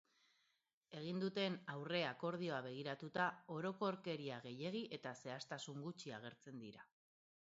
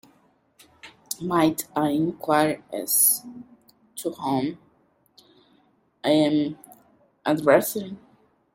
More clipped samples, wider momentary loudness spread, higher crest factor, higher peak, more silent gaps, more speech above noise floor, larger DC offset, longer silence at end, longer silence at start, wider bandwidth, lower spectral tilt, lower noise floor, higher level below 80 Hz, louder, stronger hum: neither; second, 13 LU vs 16 LU; about the same, 22 dB vs 22 dB; second, -24 dBFS vs -4 dBFS; neither; about the same, 39 dB vs 41 dB; neither; first, 0.7 s vs 0.55 s; about the same, 0.9 s vs 0.85 s; second, 7.6 kHz vs 16.5 kHz; about the same, -4 dB/octave vs -4 dB/octave; first, -85 dBFS vs -63 dBFS; second, -90 dBFS vs -66 dBFS; second, -46 LUFS vs -23 LUFS; neither